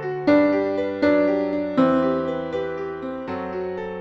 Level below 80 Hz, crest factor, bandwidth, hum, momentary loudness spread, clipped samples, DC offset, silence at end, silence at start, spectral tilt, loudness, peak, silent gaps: -56 dBFS; 16 dB; 6.2 kHz; none; 11 LU; under 0.1%; under 0.1%; 0 s; 0 s; -8 dB/octave; -22 LUFS; -6 dBFS; none